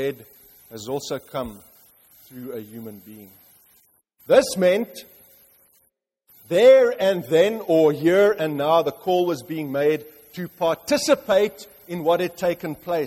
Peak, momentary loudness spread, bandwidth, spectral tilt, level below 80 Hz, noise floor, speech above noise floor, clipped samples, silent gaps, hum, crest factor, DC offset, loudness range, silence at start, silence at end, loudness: -4 dBFS; 21 LU; 16.5 kHz; -5 dB/octave; -62 dBFS; -68 dBFS; 47 dB; under 0.1%; none; none; 18 dB; under 0.1%; 16 LU; 0 s; 0 s; -20 LUFS